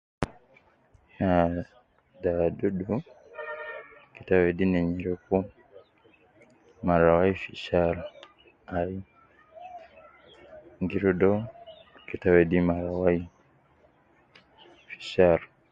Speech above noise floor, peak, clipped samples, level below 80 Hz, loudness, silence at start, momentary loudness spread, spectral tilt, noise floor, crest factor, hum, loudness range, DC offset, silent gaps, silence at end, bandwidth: 37 dB; -6 dBFS; under 0.1%; -48 dBFS; -26 LUFS; 0.2 s; 23 LU; -8.5 dB/octave; -62 dBFS; 22 dB; none; 5 LU; under 0.1%; none; 0.25 s; 7.6 kHz